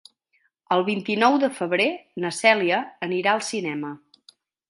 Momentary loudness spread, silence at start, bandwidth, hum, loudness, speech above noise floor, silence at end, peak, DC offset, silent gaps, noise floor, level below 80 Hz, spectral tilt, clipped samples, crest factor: 11 LU; 0.7 s; 11.5 kHz; none; -22 LUFS; 46 dB; 0.75 s; -2 dBFS; under 0.1%; none; -69 dBFS; -76 dBFS; -4 dB/octave; under 0.1%; 22 dB